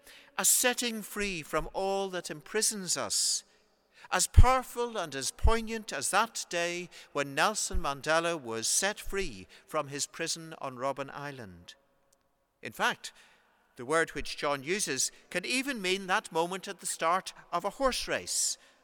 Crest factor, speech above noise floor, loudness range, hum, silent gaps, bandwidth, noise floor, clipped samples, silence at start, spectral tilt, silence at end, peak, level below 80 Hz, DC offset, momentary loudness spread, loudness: 26 dB; 41 dB; 8 LU; none; none; 19 kHz; -72 dBFS; under 0.1%; 0.05 s; -2.5 dB/octave; 0.3 s; -6 dBFS; -38 dBFS; under 0.1%; 11 LU; -30 LUFS